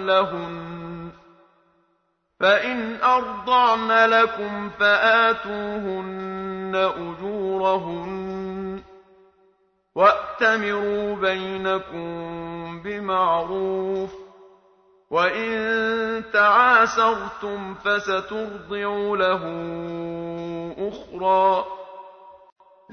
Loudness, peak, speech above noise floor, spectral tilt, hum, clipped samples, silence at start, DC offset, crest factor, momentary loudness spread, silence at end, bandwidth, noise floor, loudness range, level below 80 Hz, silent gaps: -22 LUFS; -4 dBFS; 48 dB; -5 dB/octave; none; under 0.1%; 0 s; under 0.1%; 18 dB; 16 LU; 0.55 s; 6.6 kHz; -70 dBFS; 7 LU; -58 dBFS; none